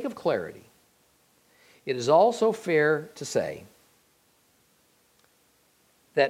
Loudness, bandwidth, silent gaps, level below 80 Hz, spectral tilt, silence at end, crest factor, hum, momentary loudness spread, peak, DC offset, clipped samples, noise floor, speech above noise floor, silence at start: -25 LUFS; 15.5 kHz; none; -74 dBFS; -4.5 dB/octave; 0 s; 20 dB; none; 17 LU; -8 dBFS; under 0.1%; under 0.1%; -65 dBFS; 40 dB; 0 s